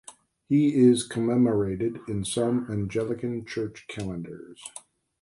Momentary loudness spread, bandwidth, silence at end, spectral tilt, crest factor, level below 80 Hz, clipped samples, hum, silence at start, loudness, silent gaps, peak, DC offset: 20 LU; 11.5 kHz; 0.4 s; -6 dB/octave; 18 dB; -56 dBFS; under 0.1%; none; 0.1 s; -26 LUFS; none; -8 dBFS; under 0.1%